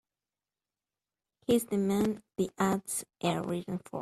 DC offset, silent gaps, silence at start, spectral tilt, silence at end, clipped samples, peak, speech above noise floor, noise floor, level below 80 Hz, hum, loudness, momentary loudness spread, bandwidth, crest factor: under 0.1%; none; 1.5 s; -5.5 dB/octave; 0 s; under 0.1%; -16 dBFS; over 59 dB; under -90 dBFS; -66 dBFS; 50 Hz at -75 dBFS; -32 LUFS; 8 LU; 14.5 kHz; 18 dB